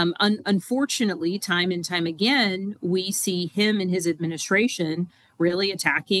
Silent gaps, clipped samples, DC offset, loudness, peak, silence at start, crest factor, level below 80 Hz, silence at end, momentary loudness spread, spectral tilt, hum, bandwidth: none; under 0.1%; under 0.1%; -23 LUFS; -4 dBFS; 0 s; 20 dB; -70 dBFS; 0 s; 6 LU; -4 dB/octave; none; 13 kHz